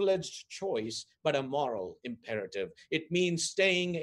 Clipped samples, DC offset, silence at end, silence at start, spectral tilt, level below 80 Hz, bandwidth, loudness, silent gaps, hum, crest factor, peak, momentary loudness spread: under 0.1%; under 0.1%; 0 s; 0 s; -4 dB/octave; -72 dBFS; 12 kHz; -32 LUFS; none; none; 20 dB; -12 dBFS; 12 LU